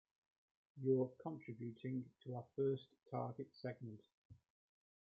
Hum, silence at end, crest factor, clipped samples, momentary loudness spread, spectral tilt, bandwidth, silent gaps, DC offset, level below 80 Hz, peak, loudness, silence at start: none; 0.7 s; 20 dB; under 0.1%; 12 LU; -8.5 dB/octave; 5 kHz; 4.14-4.30 s; under 0.1%; -86 dBFS; -26 dBFS; -45 LUFS; 0.75 s